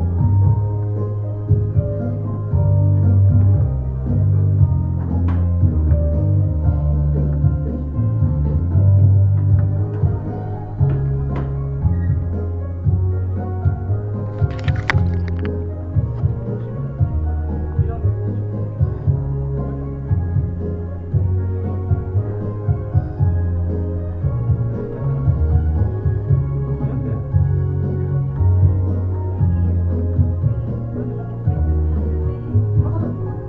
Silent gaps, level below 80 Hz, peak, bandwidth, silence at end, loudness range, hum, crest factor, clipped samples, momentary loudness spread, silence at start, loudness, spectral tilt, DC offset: none; -26 dBFS; 0 dBFS; 4.9 kHz; 0 s; 5 LU; none; 18 dB; under 0.1%; 8 LU; 0 s; -19 LUFS; -10 dB/octave; under 0.1%